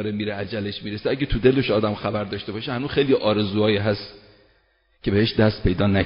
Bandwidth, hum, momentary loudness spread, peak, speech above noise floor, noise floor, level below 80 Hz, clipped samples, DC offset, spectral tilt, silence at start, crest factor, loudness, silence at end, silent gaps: 5.4 kHz; none; 10 LU; -4 dBFS; 41 dB; -63 dBFS; -40 dBFS; under 0.1%; under 0.1%; -5 dB/octave; 0 s; 18 dB; -22 LUFS; 0 s; none